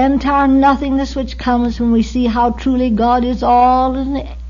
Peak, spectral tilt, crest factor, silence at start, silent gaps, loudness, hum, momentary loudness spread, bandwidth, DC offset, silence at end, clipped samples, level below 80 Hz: -2 dBFS; -7 dB/octave; 12 dB; 0 s; none; -14 LUFS; none; 7 LU; 7.4 kHz; under 0.1%; 0 s; under 0.1%; -28 dBFS